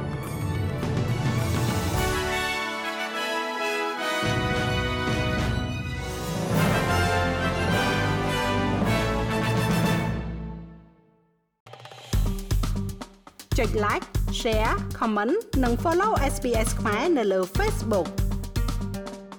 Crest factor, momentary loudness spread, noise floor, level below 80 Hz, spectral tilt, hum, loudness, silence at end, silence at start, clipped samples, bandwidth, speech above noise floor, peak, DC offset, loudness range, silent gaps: 14 dB; 8 LU; -65 dBFS; -34 dBFS; -5.5 dB/octave; none; -26 LUFS; 0 s; 0 s; under 0.1%; over 20 kHz; 42 dB; -12 dBFS; under 0.1%; 5 LU; 11.60-11.66 s